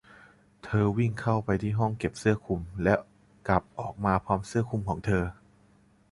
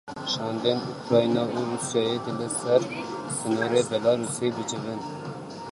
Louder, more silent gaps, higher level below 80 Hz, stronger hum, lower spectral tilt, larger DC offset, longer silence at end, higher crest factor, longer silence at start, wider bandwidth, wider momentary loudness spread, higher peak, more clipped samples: second, -29 LUFS vs -26 LUFS; neither; first, -48 dBFS vs -64 dBFS; neither; first, -7.5 dB/octave vs -4.5 dB/octave; neither; first, 0.8 s vs 0 s; about the same, 22 dB vs 20 dB; first, 0.65 s vs 0.05 s; about the same, 11.5 kHz vs 11.5 kHz; second, 5 LU vs 10 LU; about the same, -8 dBFS vs -6 dBFS; neither